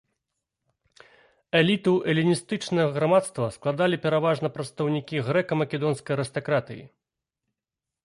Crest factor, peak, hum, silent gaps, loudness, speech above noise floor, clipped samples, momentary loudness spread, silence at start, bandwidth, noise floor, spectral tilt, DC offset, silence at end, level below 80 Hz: 18 dB; -8 dBFS; none; none; -25 LUFS; 64 dB; under 0.1%; 7 LU; 1.55 s; 11.5 kHz; -89 dBFS; -6 dB/octave; under 0.1%; 1.15 s; -64 dBFS